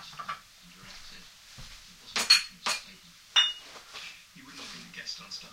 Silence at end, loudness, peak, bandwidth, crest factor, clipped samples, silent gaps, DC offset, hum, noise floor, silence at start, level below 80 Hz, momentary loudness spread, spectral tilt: 0 s; -27 LUFS; -6 dBFS; 16 kHz; 26 dB; under 0.1%; none; under 0.1%; none; -53 dBFS; 0 s; -62 dBFS; 26 LU; 1 dB/octave